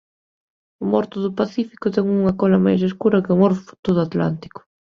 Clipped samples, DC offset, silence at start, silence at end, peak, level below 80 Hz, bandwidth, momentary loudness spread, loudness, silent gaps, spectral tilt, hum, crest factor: under 0.1%; under 0.1%; 0.8 s; 0.3 s; -2 dBFS; -54 dBFS; 6.6 kHz; 8 LU; -19 LUFS; 3.79-3.83 s; -9 dB/octave; none; 18 dB